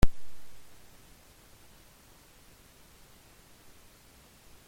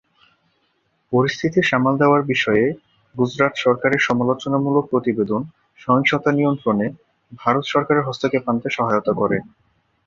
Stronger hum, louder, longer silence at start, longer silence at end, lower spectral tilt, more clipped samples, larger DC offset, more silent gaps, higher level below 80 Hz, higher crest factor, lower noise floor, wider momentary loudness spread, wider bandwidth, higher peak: neither; second, -49 LUFS vs -19 LUFS; second, 0 s vs 1.1 s; first, 4 s vs 0.65 s; about the same, -5.5 dB/octave vs -6.5 dB/octave; neither; neither; neither; first, -40 dBFS vs -58 dBFS; first, 24 dB vs 18 dB; second, -58 dBFS vs -66 dBFS; second, 0 LU vs 7 LU; first, 16.5 kHz vs 7.4 kHz; second, -6 dBFS vs -2 dBFS